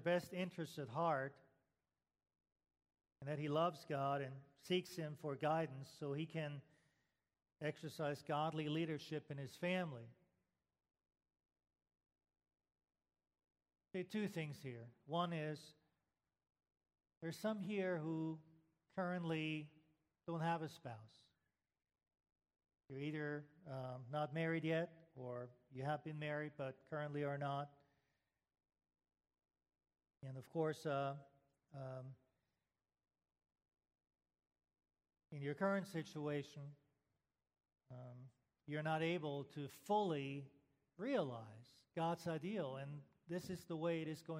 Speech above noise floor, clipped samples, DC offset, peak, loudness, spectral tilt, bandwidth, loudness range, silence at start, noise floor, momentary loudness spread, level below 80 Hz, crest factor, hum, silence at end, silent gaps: over 46 dB; under 0.1%; under 0.1%; -26 dBFS; -45 LUFS; -6.5 dB/octave; 14 kHz; 7 LU; 0 s; under -90 dBFS; 15 LU; -86 dBFS; 20 dB; none; 0 s; 17.17-17.21 s